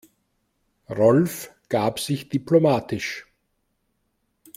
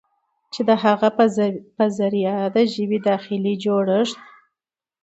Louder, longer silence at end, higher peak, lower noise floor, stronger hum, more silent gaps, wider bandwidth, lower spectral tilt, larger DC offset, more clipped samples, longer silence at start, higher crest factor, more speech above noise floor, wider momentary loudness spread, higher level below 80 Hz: about the same, -22 LUFS vs -20 LUFS; first, 1.35 s vs 0.85 s; about the same, -4 dBFS vs -2 dBFS; second, -72 dBFS vs -87 dBFS; neither; neither; first, 16.5 kHz vs 8.2 kHz; about the same, -6 dB/octave vs -6.5 dB/octave; neither; neither; first, 0.9 s vs 0.55 s; about the same, 20 dB vs 18 dB; second, 51 dB vs 68 dB; first, 15 LU vs 7 LU; first, -62 dBFS vs -68 dBFS